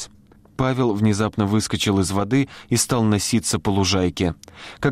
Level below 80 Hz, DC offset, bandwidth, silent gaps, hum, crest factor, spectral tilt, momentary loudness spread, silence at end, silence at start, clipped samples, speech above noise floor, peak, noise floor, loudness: -46 dBFS; under 0.1%; 16 kHz; none; none; 14 dB; -5 dB/octave; 6 LU; 0 s; 0 s; under 0.1%; 30 dB; -8 dBFS; -50 dBFS; -21 LUFS